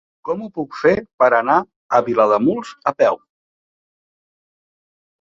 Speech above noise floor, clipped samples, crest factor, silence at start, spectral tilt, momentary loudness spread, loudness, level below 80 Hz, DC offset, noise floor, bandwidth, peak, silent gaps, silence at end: over 73 dB; under 0.1%; 20 dB; 0.25 s; -6.5 dB/octave; 11 LU; -18 LUFS; -58 dBFS; under 0.1%; under -90 dBFS; 7.8 kHz; 0 dBFS; 1.14-1.18 s, 1.76-1.89 s; 2.05 s